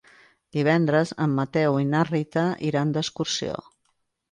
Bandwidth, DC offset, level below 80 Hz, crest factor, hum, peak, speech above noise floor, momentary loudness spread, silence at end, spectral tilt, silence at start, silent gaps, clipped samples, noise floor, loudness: 9.8 kHz; under 0.1%; -62 dBFS; 16 dB; none; -8 dBFS; 49 dB; 7 LU; 0.7 s; -6 dB/octave; 0.55 s; none; under 0.1%; -73 dBFS; -24 LUFS